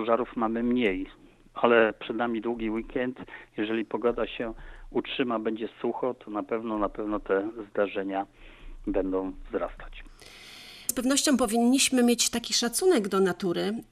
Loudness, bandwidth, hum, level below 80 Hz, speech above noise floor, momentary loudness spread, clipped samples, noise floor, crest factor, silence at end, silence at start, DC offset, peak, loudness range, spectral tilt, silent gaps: -27 LUFS; 14.5 kHz; none; -50 dBFS; 21 dB; 16 LU; under 0.1%; -48 dBFS; 22 dB; 0.1 s; 0 s; under 0.1%; -6 dBFS; 7 LU; -3 dB/octave; none